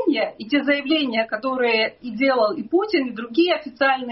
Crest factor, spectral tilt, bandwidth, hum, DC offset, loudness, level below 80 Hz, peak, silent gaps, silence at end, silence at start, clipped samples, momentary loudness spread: 14 dB; -1 dB/octave; 5.8 kHz; none; under 0.1%; -21 LUFS; -66 dBFS; -6 dBFS; none; 0 s; 0 s; under 0.1%; 4 LU